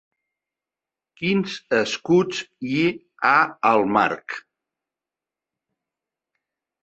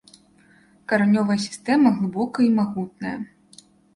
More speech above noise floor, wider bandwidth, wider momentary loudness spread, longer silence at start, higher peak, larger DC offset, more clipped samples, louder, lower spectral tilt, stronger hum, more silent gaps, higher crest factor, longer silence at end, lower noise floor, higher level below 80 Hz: first, 68 dB vs 35 dB; second, 8.2 kHz vs 11.5 kHz; second, 11 LU vs 14 LU; first, 1.2 s vs 0.9 s; about the same, -2 dBFS vs -4 dBFS; neither; neither; about the same, -21 LUFS vs -21 LUFS; about the same, -5.5 dB/octave vs -6 dB/octave; neither; neither; about the same, 22 dB vs 18 dB; first, 2.45 s vs 0.7 s; first, -89 dBFS vs -55 dBFS; about the same, -66 dBFS vs -64 dBFS